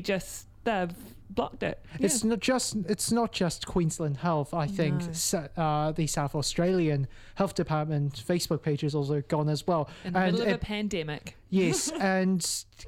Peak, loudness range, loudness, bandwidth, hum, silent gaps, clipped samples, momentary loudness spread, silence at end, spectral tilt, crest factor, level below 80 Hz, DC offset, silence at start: -12 dBFS; 1 LU; -29 LUFS; 16.5 kHz; none; none; under 0.1%; 7 LU; 0 s; -5 dB/octave; 18 dB; -50 dBFS; under 0.1%; 0 s